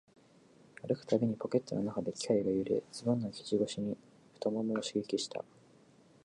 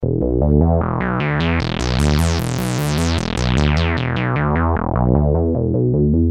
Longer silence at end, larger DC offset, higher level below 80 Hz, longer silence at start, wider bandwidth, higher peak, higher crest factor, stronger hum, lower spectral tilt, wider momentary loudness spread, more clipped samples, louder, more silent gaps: first, 0.8 s vs 0 s; second, under 0.1% vs 0.1%; second, -72 dBFS vs -26 dBFS; first, 0.85 s vs 0 s; second, 11 kHz vs 16.5 kHz; second, -16 dBFS vs -2 dBFS; about the same, 20 dB vs 16 dB; neither; about the same, -6 dB/octave vs -6.5 dB/octave; first, 8 LU vs 4 LU; neither; second, -35 LUFS vs -18 LUFS; neither